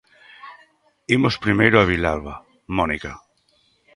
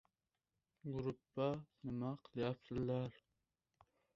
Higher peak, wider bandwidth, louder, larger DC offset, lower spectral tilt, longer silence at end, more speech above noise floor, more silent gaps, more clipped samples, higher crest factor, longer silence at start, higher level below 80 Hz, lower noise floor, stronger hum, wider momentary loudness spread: first, 0 dBFS vs -26 dBFS; first, 11.5 kHz vs 7.2 kHz; first, -19 LUFS vs -44 LUFS; neither; about the same, -6.5 dB/octave vs -7.5 dB/octave; second, 0.8 s vs 1.05 s; second, 43 dB vs over 47 dB; neither; neither; about the same, 22 dB vs 20 dB; second, 0.45 s vs 0.85 s; first, -42 dBFS vs -70 dBFS; second, -62 dBFS vs under -90 dBFS; neither; first, 25 LU vs 7 LU